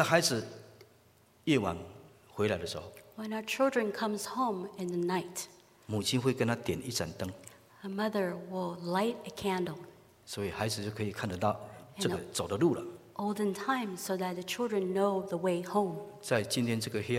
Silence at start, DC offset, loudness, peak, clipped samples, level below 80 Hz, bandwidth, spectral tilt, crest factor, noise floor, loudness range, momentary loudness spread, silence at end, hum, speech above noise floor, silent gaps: 0 s; under 0.1%; -33 LUFS; -10 dBFS; under 0.1%; -66 dBFS; 16 kHz; -4.5 dB/octave; 24 dB; -64 dBFS; 3 LU; 12 LU; 0 s; none; 31 dB; none